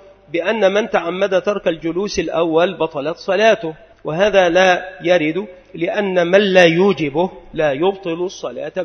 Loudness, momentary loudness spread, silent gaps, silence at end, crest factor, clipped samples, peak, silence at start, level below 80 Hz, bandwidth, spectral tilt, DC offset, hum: -16 LUFS; 12 LU; none; 0 s; 16 dB; under 0.1%; 0 dBFS; 0.35 s; -50 dBFS; 6.6 kHz; -5 dB/octave; under 0.1%; none